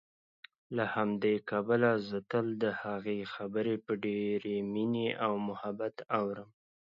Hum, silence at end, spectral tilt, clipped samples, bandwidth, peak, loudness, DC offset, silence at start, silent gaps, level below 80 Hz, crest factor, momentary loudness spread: none; 0.5 s; -8.5 dB/octave; under 0.1%; 7 kHz; -14 dBFS; -34 LUFS; under 0.1%; 0.7 s; none; -76 dBFS; 20 dB; 8 LU